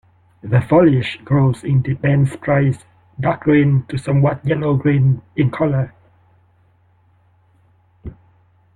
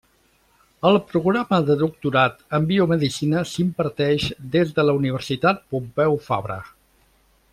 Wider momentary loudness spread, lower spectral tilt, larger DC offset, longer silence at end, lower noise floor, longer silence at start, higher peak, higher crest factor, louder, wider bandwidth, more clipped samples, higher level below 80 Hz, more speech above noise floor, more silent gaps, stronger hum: first, 14 LU vs 5 LU; first, -9 dB/octave vs -6.5 dB/octave; neither; second, 0.65 s vs 0.85 s; second, -55 dBFS vs -61 dBFS; second, 0.45 s vs 0.85 s; about the same, -2 dBFS vs -4 dBFS; about the same, 16 dB vs 18 dB; first, -17 LUFS vs -21 LUFS; second, 10 kHz vs 14.5 kHz; neither; first, -48 dBFS vs -54 dBFS; about the same, 40 dB vs 40 dB; neither; neither